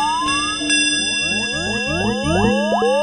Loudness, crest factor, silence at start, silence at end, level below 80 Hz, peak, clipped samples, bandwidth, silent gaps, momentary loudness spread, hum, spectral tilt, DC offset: -17 LUFS; 14 dB; 0 s; 0 s; -40 dBFS; -4 dBFS; under 0.1%; 11.5 kHz; none; 5 LU; none; -3 dB/octave; 0.2%